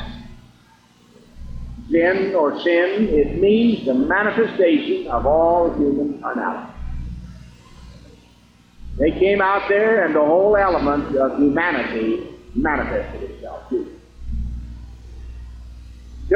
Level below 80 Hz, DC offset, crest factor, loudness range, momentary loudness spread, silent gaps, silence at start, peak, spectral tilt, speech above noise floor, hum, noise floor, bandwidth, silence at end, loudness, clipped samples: -36 dBFS; under 0.1%; 14 dB; 10 LU; 22 LU; none; 0 s; -6 dBFS; -8 dB/octave; 34 dB; 60 Hz at -35 dBFS; -52 dBFS; 7.6 kHz; 0 s; -18 LUFS; under 0.1%